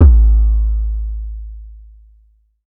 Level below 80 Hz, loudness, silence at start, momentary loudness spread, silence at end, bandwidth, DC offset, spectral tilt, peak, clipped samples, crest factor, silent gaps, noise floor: -14 dBFS; -16 LUFS; 0 s; 22 LU; 0.9 s; 1.6 kHz; under 0.1%; -13 dB/octave; 0 dBFS; under 0.1%; 14 dB; none; -53 dBFS